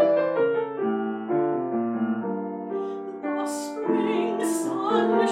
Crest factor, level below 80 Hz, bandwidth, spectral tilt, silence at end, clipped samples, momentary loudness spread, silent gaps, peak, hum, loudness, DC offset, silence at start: 16 dB; -84 dBFS; 15.5 kHz; -5.5 dB/octave; 0 s; under 0.1%; 9 LU; none; -10 dBFS; none; -26 LUFS; under 0.1%; 0 s